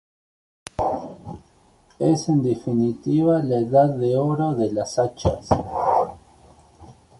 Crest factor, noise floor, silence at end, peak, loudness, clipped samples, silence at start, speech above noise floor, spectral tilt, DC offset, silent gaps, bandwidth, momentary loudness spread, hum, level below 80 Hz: 18 dB; -56 dBFS; 0.25 s; -4 dBFS; -22 LUFS; under 0.1%; 0.8 s; 36 dB; -7.5 dB/octave; under 0.1%; none; 11.5 kHz; 15 LU; none; -44 dBFS